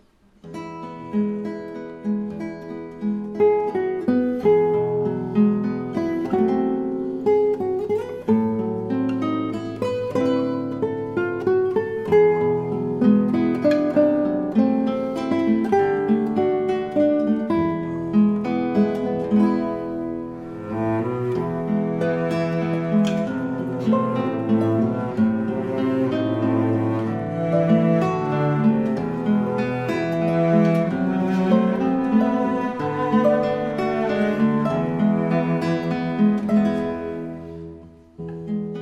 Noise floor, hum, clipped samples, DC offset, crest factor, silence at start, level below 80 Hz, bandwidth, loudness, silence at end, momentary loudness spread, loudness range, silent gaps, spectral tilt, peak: -46 dBFS; none; under 0.1%; under 0.1%; 14 dB; 0.45 s; -54 dBFS; 7.8 kHz; -21 LUFS; 0 s; 9 LU; 4 LU; none; -9 dB/octave; -6 dBFS